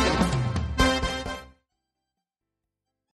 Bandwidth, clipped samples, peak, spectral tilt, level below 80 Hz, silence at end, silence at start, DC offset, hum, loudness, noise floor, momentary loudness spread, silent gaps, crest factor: 13 kHz; under 0.1%; -8 dBFS; -5 dB/octave; -36 dBFS; 1.7 s; 0 s; under 0.1%; none; -26 LUFS; -85 dBFS; 12 LU; none; 20 dB